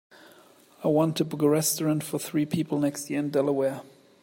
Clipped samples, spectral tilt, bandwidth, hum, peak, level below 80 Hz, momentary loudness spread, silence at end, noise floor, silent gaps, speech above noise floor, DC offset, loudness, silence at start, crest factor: under 0.1%; -5.5 dB/octave; 16.5 kHz; none; -10 dBFS; -70 dBFS; 6 LU; 0.35 s; -55 dBFS; none; 30 dB; under 0.1%; -26 LUFS; 0.8 s; 16 dB